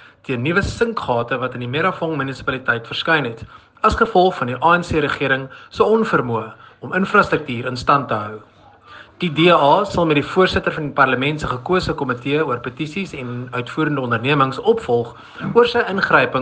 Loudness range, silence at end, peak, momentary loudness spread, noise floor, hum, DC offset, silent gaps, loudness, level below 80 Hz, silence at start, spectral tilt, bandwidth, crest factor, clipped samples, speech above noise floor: 4 LU; 0 s; 0 dBFS; 11 LU; -43 dBFS; none; under 0.1%; none; -18 LUFS; -44 dBFS; 0.3 s; -6 dB/octave; 9.4 kHz; 18 dB; under 0.1%; 25 dB